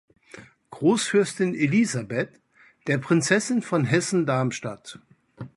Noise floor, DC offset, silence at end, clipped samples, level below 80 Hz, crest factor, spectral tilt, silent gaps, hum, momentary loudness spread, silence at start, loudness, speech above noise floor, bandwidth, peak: -48 dBFS; under 0.1%; 0.1 s; under 0.1%; -66 dBFS; 20 dB; -5 dB/octave; none; none; 14 LU; 0.35 s; -23 LUFS; 25 dB; 11.5 kHz; -6 dBFS